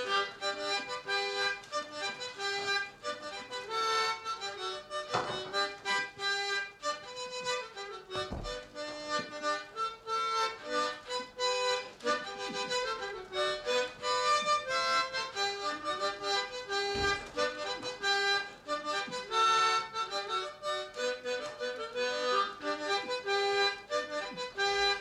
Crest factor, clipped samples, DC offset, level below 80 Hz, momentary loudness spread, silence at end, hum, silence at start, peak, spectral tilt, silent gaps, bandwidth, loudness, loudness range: 16 dB; under 0.1%; under 0.1%; -62 dBFS; 9 LU; 0 s; none; 0 s; -18 dBFS; -1.5 dB/octave; none; 13.5 kHz; -33 LUFS; 4 LU